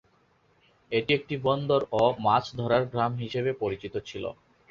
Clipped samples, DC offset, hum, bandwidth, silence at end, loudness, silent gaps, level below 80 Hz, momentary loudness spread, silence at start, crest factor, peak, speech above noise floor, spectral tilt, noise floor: under 0.1%; under 0.1%; none; 7.4 kHz; 0.35 s; -27 LUFS; none; -58 dBFS; 11 LU; 0.9 s; 20 dB; -8 dBFS; 39 dB; -7 dB/octave; -65 dBFS